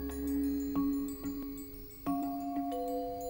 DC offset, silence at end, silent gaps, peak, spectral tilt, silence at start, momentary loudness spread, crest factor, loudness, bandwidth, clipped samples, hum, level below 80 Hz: under 0.1%; 0 s; none; -22 dBFS; -6.5 dB/octave; 0 s; 8 LU; 14 dB; -36 LUFS; 18 kHz; under 0.1%; none; -52 dBFS